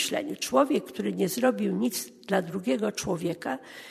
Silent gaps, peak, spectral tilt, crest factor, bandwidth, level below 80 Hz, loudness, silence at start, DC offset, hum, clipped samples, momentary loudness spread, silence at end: none; -8 dBFS; -4.5 dB/octave; 20 dB; 13.5 kHz; -66 dBFS; -28 LUFS; 0 s; under 0.1%; none; under 0.1%; 8 LU; 0 s